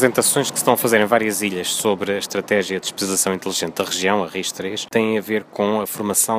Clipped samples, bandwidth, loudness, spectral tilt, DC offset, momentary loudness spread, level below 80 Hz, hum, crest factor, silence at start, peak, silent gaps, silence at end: under 0.1%; 16 kHz; -19 LUFS; -3 dB/octave; under 0.1%; 7 LU; -64 dBFS; none; 20 dB; 0 s; 0 dBFS; none; 0 s